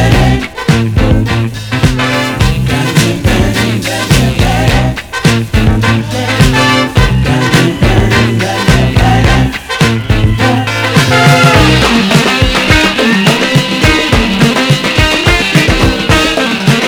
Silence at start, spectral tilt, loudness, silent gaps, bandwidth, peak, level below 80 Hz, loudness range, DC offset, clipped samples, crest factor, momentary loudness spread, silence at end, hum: 0 s; -5 dB/octave; -9 LUFS; none; over 20 kHz; 0 dBFS; -18 dBFS; 3 LU; under 0.1%; 1%; 8 dB; 5 LU; 0 s; none